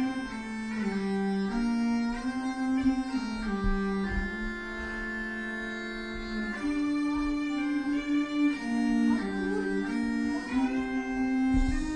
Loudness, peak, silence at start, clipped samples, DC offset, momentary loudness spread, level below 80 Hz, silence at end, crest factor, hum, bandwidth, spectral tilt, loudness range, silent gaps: -30 LUFS; -16 dBFS; 0 s; under 0.1%; 0.1%; 7 LU; -40 dBFS; 0 s; 14 dB; none; 10.5 kHz; -6 dB/octave; 4 LU; none